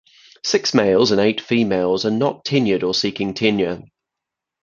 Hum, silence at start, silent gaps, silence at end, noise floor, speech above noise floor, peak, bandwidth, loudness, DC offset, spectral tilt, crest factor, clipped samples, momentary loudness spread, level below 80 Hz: none; 0.45 s; none; 0.85 s; -84 dBFS; 66 dB; 0 dBFS; 7.6 kHz; -18 LUFS; under 0.1%; -5 dB/octave; 18 dB; under 0.1%; 7 LU; -54 dBFS